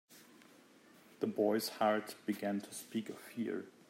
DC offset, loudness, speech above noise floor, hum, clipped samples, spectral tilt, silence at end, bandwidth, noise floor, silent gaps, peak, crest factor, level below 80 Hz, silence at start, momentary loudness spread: under 0.1%; -38 LUFS; 26 dB; none; under 0.1%; -4.5 dB/octave; 0.2 s; 16 kHz; -63 dBFS; none; -20 dBFS; 20 dB; -88 dBFS; 0.1 s; 9 LU